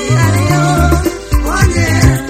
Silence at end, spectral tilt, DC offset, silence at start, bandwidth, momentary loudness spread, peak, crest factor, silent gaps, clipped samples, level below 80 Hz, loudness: 0 s; -5.5 dB/octave; under 0.1%; 0 s; 16 kHz; 5 LU; 0 dBFS; 10 dB; none; 0.5%; -18 dBFS; -12 LUFS